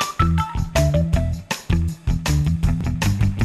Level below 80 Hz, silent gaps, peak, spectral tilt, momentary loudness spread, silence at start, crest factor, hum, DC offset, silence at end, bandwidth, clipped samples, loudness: -26 dBFS; none; -4 dBFS; -6 dB/octave; 5 LU; 0 s; 16 dB; none; under 0.1%; 0 s; 15 kHz; under 0.1%; -21 LUFS